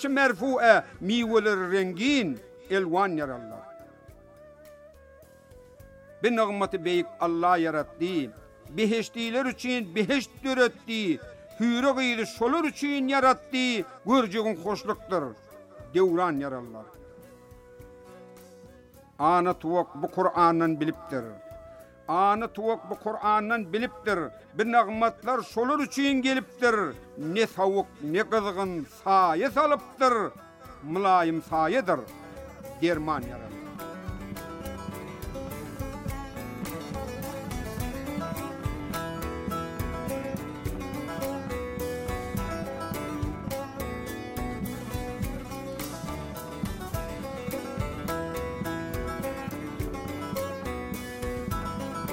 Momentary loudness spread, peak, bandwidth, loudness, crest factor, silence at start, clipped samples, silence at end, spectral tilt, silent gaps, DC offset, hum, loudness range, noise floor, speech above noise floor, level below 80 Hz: 14 LU; -6 dBFS; 16.5 kHz; -28 LUFS; 22 dB; 0 s; under 0.1%; 0 s; -5.5 dB/octave; none; under 0.1%; none; 9 LU; -53 dBFS; 27 dB; -48 dBFS